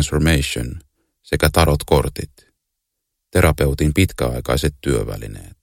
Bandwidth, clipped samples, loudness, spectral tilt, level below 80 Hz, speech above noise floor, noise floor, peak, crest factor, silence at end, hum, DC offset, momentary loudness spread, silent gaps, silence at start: 17 kHz; under 0.1%; -18 LUFS; -5.5 dB/octave; -28 dBFS; 59 dB; -77 dBFS; 0 dBFS; 20 dB; 0.15 s; none; under 0.1%; 15 LU; none; 0 s